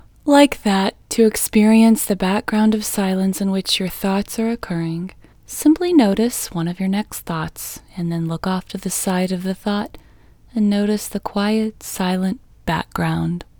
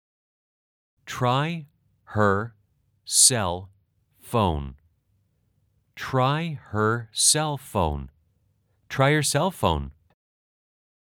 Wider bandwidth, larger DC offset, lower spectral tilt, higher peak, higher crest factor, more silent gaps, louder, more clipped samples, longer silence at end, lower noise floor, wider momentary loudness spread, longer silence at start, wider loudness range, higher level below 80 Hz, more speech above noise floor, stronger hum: about the same, over 20 kHz vs over 20 kHz; neither; first, -5 dB/octave vs -3.5 dB/octave; about the same, 0 dBFS vs -2 dBFS; second, 18 dB vs 24 dB; neither; first, -19 LUFS vs -23 LUFS; neither; second, 0.15 s vs 1.25 s; second, -48 dBFS vs -68 dBFS; second, 12 LU vs 18 LU; second, 0.25 s vs 1.05 s; about the same, 6 LU vs 5 LU; about the same, -46 dBFS vs -46 dBFS; second, 29 dB vs 45 dB; neither